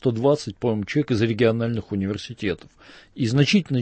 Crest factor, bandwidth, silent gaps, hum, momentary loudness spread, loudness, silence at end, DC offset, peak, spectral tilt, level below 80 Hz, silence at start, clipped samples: 16 dB; 8.8 kHz; none; none; 9 LU; -23 LUFS; 0 s; under 0.1%; -6 dBFS; -6.5 dB/octave; -54 dBFS; 0 s; under 0.1%